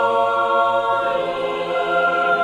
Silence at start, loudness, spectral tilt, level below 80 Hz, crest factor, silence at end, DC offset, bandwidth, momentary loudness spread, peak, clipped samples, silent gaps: 0 s; -19 LUFS; -4.5 dB/octave; -58 dBFS; 12 dB; 0 s; under 0.1%; 10.5 kHz; 5 LU; -6 dBFS; under 0.1%; none